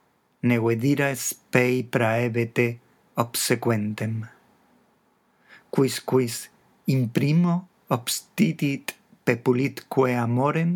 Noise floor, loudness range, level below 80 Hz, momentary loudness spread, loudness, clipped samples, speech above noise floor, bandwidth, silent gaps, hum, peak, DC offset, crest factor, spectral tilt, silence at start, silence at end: -65 dBFS; 4 LU; -76 dBFS; 8 LU; -24 LUFS; under 0.1%; 42 dB; 19.5 kHz; none; none; -4 dBFS; under 0.1%; 20 dB; -5.5 dB/octave; 0.45 s; 0 s